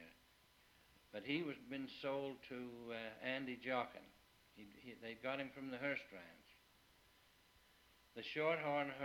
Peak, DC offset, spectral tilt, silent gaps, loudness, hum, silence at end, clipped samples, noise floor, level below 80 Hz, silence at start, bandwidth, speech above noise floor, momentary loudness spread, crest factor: -26 dBFS; under 0.1%; -5.5 dB/octave; none; -45 LUFS; none; 0 s; under 0.1%; -72 dBFS; -80 dBFS; 0 s; 19.5 kHz; 26 dB; 20 LU; 22 dB